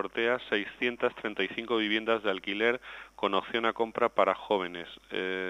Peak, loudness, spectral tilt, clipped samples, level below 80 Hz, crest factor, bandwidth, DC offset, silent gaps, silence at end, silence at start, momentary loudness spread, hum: -10 dBFS; -30 LUFS; -5 dB/octave; under 0.1%; -66 dBFS; 20 dB; 10.5 kHz; under 0.1%; none; 0 s; 0 s; 7 LU; none